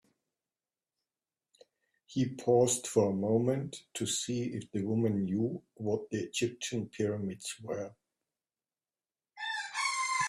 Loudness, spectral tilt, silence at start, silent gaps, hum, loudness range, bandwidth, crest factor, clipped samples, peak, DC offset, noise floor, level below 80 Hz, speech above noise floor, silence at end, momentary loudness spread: -33 LUFS; -4.5 dB/octave; 2.1 s; none; none; 7 LU; 14.5 kHz; 22 dB; under 0.1%; -14 dBFS; under 0.1%; under -90 dBFS; -72 dBFS; over 58 dB; 0 s; 11 LU